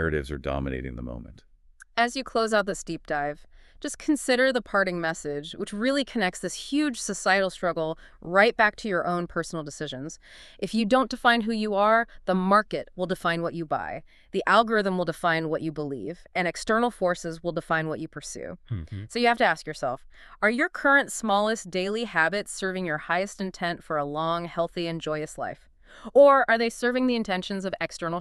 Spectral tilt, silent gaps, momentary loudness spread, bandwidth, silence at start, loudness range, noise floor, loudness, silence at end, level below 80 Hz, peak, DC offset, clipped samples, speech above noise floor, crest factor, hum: -4.5 dB/octave; none; 13 LU; 13 kHz; 0 s; 5 LU; -45 dBFS; -26 LUFS; 0 s; -50 dBFS; -6 dBFS; under 0.1%; under 0.1%; 19 dB; 20 dB; none